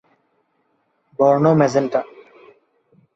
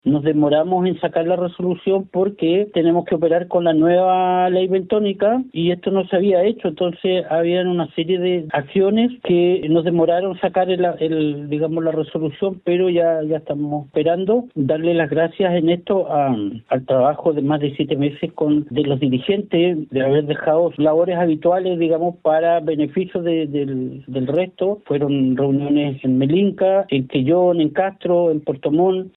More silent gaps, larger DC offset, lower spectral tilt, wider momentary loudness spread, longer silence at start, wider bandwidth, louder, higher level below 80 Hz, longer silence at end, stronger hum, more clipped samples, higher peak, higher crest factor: neither; neither; second, -7.5 dB/octave vs -11 dB/octave; first, 21 LU vs 6 LU; first, 1.2 s vs 0.05 s; first, 7.8 kHz vs 4.1 kHz; about the same, -17 LUFS vs -18 LUFS; about the same, -64 dBFS vs -60 dBFS; first, 1.1 s vs 0.05 s; neither; neither; about the same, -2 dBFS vs -4 dBFS; first, 18 dB vs 12 dB